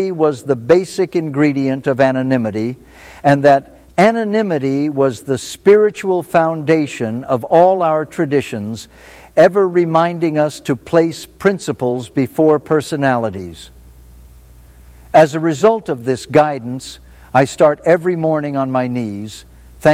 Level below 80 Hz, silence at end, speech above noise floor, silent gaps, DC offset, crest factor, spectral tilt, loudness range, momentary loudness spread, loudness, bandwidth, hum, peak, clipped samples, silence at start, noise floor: -50 dBFS; 0 s; 27 dB; none; under 0.1%; 16 dB; -6.5 dB/octave; 3 LU; 11 LU; -15 LUFS; 15.5 kHz; none; 0 dBFS; under 0.1%; 0 s; -42 dBFS